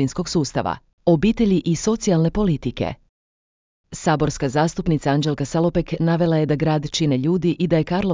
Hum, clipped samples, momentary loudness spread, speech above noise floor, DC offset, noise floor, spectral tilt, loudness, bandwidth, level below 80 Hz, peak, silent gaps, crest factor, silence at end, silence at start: none; under 0.1%; 7 LU; over 71 dB; under 0.1%; under -90 dBFS; -6.5 dB/octave; -20 LUFS; 7.6 kHz; -40 dBFS; -4 dBFS; 0.93-0.98 s, 3.09-3.84 s; 16 dB; 0 s; 0 s